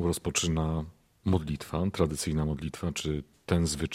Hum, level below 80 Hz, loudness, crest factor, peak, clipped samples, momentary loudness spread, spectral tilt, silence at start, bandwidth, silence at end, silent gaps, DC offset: none; -46 dBFS; -31 LUFS; 20 dB; -10 dBFS; under 0.1%; 7 LU; -5 dB/octave; 0 s; 16 kHz; 0 s; none; under 0.1%